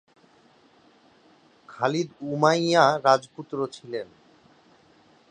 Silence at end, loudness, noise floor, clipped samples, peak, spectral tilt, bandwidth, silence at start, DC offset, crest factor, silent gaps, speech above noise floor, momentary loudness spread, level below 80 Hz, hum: 1.25 s; -24 LUFS; -58 dBFS; under 0.1%; -2 dBFS; -5 dB/octave; 10 kHz; 1.7 s; under 0.1%; 24 dB; none; 35 dB; 16 LU; -74 dBFS; none